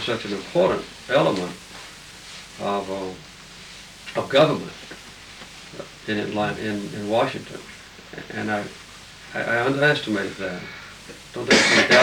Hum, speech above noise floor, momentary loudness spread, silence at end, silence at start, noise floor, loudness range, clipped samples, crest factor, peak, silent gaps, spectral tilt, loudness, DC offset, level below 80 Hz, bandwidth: none; 21 dB; 21 LU; 0 s; 0 s; -43 dBFS; 4 LU; under 0.1%; 18 dB; -6 dBFS; none; -4 dB/octave; -22 LUFS; under 0.1%; -56 dBFS; 19 kHz